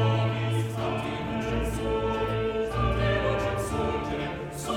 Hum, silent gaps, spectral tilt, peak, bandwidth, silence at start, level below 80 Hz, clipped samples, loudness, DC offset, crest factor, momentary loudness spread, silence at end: none; none; -6 dB/octave; -14 dBFS; 16 kHz; 0 s; -38 dBFS; under 0.1%; -28 LUFS; under 0.1%; 14 dB; 5 LU; 0 s